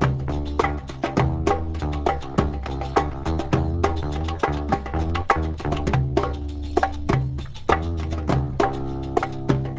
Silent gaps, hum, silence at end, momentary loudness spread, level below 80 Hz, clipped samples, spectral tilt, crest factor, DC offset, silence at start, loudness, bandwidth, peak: none; none; 0 s; 5 LU; -30 dBFS; under 0.1%; -7 dB/octave; 22 dB; under 0.1%; 0 s; -24 LUFS; 8 kHz; -2 dBFS